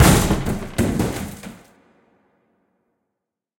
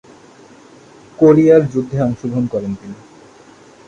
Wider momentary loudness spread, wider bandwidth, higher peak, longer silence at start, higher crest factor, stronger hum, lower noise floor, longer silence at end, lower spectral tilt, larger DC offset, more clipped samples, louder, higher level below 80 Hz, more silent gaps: about the same, 19 LU vs 19 LU; first, 17 kHz vs 7.6 kHz; about the same, 0 dBFS vs 0 dBFS; second, 0 s vs 1.2 s; first, 22 dB vs 16 dB; neither; first, -81 dBFS vs -43 dBFS; first, 2.05 s vs 0.95 s; second, -5 dB/octave vs -9 dB/octave; neither; neither; second, -21 LUFS vs -14 LUFS; first, -32 dBFS vs -50 dBFS; neither